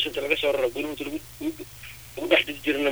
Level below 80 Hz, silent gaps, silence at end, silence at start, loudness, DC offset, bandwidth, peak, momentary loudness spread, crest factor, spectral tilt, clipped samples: -54 dBFS; none; 0 s; 0 s; -26 LUFS; 0.2%; over 20 kHz; -6 dBFS; 17 LU; 22 dB; -3.5 dB/octave; under 0.1%